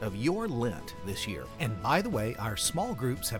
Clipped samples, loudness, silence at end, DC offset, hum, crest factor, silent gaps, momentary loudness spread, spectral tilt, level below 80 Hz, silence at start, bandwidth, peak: under 0.1%; -32 LUFS; 0 s; under 0.1%; none; 18 dB; none; 8 LU; -4.5 dB/octave; -50 dBFS; 0 s; 18.5 kHz; -12 dBFS